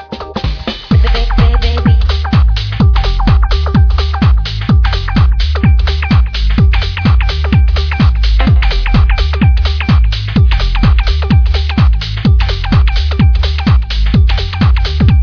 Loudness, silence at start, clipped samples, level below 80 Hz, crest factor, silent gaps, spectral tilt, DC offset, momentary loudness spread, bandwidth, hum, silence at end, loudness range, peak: -12 LUFS; 0 s; under 0.1%; -10 dBFS; 10 dB; none; -7.5 dB/octave; under 0.1%; 2 LU; 5.4 kHz; none; 0 s; 1 LU; 0 dBFS